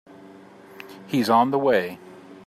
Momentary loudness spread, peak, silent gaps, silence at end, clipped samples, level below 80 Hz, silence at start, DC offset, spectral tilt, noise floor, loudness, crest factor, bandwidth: 23 LU; -6 dBFS; none; 0.15 s; under 0.1%; -72 dBFS; 0.25 s; under 0.1%; -6 dB/octave; -46 dBFS; -21 LUFS; 20 dB; 15 kHz